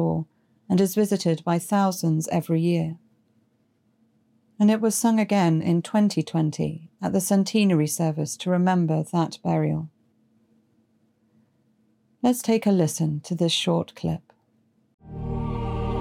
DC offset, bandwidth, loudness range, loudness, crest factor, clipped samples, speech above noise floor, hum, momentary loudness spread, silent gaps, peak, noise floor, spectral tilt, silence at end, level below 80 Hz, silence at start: under 0.1%; 16.5 kHz; 5 LU; -24 LUFS; 16 dB; under 0.1%; 44 dB; none; 10 LU; 14.94-14.98 s; -10 dBFS; -67 dBFS; -6 dB/octave; 0 s; -46 dBFS; 0 s